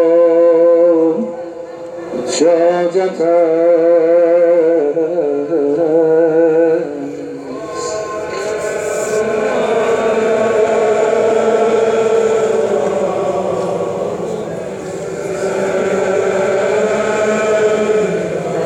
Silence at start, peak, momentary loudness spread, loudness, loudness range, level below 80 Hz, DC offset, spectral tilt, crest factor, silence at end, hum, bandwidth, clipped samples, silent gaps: 0 s; -2 dBFS; 12 LU; -14 LUFS; 6 LU; -54 dBFS; under 0.1%; -5 dB/octave; 12 dB; 0 s; none; 11 kHz; under 0.1%; none